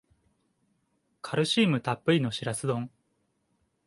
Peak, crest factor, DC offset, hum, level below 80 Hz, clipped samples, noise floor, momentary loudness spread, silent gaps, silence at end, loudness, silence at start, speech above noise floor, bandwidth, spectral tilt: -10 dBFS; 20 dB; under 0.1%; none; -68 dBFS; under 0.1%; -74 dBFS; 11 LU; none; 1 s; -28 LUFS; 1.25 s; 48 dB; 11.5 kHz; -5 dB/octave